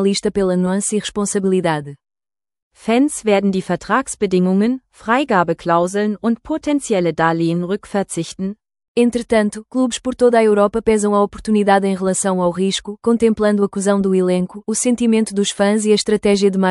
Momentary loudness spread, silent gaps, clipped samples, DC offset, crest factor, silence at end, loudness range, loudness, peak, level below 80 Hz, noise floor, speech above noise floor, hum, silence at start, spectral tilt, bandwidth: 7 LU; 2.62-2.71 s, 8.88-8.95 s; under 0.1%; under 0.1%; 16 dB; 0 s; 3 LU; -17 LUFS; 0 dBFS; -48 dBFS; under -90 dBFS; over 74 dB; none; 0 s; -5 dB/octave; 12 kHz